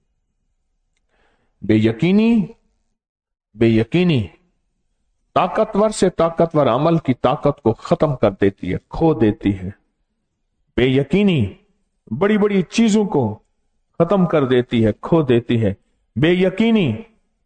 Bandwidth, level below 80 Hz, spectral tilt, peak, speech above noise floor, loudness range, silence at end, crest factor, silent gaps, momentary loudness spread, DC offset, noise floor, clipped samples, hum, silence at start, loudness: 9.4 kHz; -44 dBFS; -7 dB/octave; -4 dBFS; 54 dB; 3 LU; 0.4 s; 16 dB; 3.09-3.15 s; 10 LU; under 0.1%; -71 dBFS; under 0.1%; none; 1.65 s; -17 LUFS